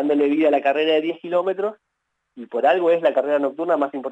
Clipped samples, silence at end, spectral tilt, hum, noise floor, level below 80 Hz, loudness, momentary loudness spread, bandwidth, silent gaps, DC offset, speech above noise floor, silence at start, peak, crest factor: under 0.1%; 0 s; -6 dB/octave; none; -76 dBFS; -86 dBFS; -20 LUFS; 6 LU; 8 kHz; none; under 0.1%; 57 dB; 0 s; -6 dBFS; 14 dB